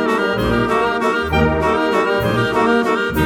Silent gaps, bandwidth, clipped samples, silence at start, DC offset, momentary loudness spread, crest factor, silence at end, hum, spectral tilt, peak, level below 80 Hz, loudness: none; 19 kHz; under 0.1%; 0 s; under 0.1%; 2 LU; 14 dB; 0 s; none; -6 dB/octave; -2 dBFS; -32 dBFS; -16 LUFS